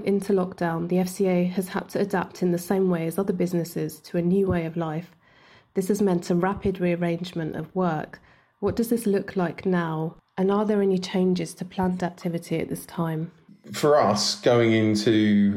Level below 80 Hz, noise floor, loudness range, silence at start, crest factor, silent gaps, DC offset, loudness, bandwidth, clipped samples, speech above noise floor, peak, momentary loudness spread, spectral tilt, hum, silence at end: -56 dBFS; -55 dBFS; 3 LU; 0 s; 16 dB; none; under 0.1%; -25 LUFS; 16 kHz; under 0.1%; 31 dB; -8 dBFS; 11 LU; -6 dB/octave; none; 0 s